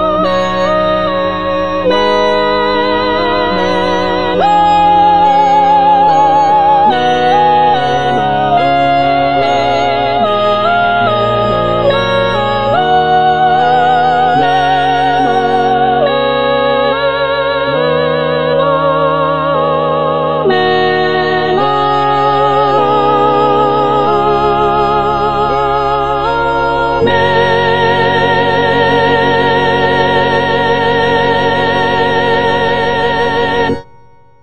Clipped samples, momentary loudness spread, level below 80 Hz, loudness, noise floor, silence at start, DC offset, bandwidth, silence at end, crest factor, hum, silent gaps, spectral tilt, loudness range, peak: under 0.1%; 4 LU; -38 dBFS; -11 LUFS; -44 dBFS; 0 s; 3%; 8.8 kHz; 0 s; 10 dB; none; none; -6 dB/octave; 3 LU; 0 dBFS